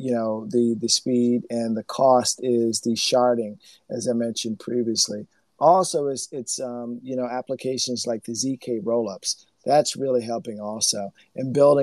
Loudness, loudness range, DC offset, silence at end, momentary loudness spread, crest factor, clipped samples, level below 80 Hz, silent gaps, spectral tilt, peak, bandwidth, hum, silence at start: -23 LUFS; 5 LU; under 0.1%; 0 s; 11 LU; 20 dB; under 0.1%; -76 dBFS; none; -4 dB/octave; -4 dBFS; 13 kHz; none; 0 s